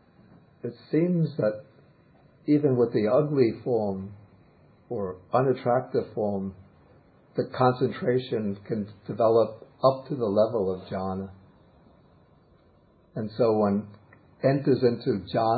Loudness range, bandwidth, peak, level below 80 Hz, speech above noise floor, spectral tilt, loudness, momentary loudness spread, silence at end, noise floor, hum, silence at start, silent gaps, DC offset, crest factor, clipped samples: 5 LU; 4.8 kHz; -6 dBFS; -60 dBFS; 34 dB; -12 dB/octave; -26 LUFS; 14 LU; 0 s; -59 dBFS; none; 0.65 s; none; under 0.1%; 20 dB; under 0.1%